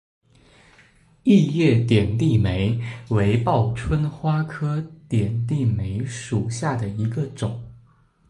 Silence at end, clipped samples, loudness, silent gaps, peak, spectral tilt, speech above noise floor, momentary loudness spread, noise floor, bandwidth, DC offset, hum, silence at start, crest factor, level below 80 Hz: 0.55 s; under 0.1%; -22 LUFS; none; -4 dBFS; -7.5 dB/octave; 35 dB; 10 LU; -56 dBFS; 11 kHz; under 0.1%; none; 1.25 s; 18 dB; -42 dBFS